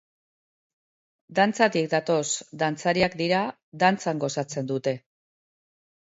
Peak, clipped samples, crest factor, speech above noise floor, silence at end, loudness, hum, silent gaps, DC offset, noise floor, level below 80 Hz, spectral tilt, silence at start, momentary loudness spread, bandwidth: -6 dBFS; under 0.1%; 22 dB; over 66 dB; 1.05 s; -25 LUFS; none; 3.63-3.72 s; under 0.1%; under -90 dBFS; -64 dBFS; -4.5 dB/octave; 1.3 s; 8 LU; 8 kHz